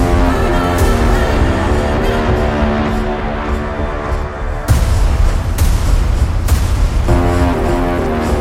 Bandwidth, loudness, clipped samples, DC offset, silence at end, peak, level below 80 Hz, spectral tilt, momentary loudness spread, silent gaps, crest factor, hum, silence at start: 16.5 kHz; -15 LUFS; under 0.1%; under 0.1%; 0 s; 0 dBFS; -16 dBFS; -6.5 dB/octave; 6 LU; none; 12 dB; none; 0 s